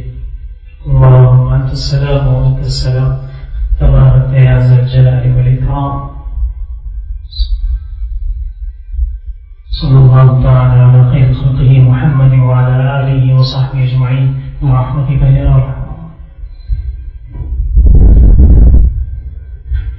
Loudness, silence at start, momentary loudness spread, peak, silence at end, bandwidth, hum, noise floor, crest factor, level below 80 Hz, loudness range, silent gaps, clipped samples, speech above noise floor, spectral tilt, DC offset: -9 LUFS; 0 s; 19 LU; 0 dBFS; 0 s; 7.6 kHz; none; -28 dBFS; 8 dB; -14 dBFS; 9 LU; none; 0.6%; 20 dB; -9 dB/octave; under 0.1%